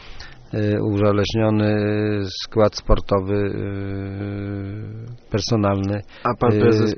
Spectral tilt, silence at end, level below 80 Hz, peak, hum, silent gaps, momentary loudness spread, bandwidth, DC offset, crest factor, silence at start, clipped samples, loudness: -6 dB/octave; 0 s; -32 dBFS; -2 dBFS; none; none; 11 LU; 6.6 kHz; under 0.1%; 18 dB; 0 s; under 0.1%; -21 LUFS